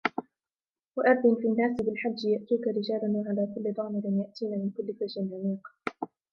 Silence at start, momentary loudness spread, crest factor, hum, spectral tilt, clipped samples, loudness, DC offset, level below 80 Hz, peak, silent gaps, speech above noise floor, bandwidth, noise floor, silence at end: 0.05 s; 12 LU; 20 dB; none; -8 dB/octave; under 0.1%; -29 LUFS; under 0.1%; -70 dBFS; -8 dBFS; 0.88-0.92 s; over 62 dB; 6.4 kHz; under -90 dBFS; 0.25 s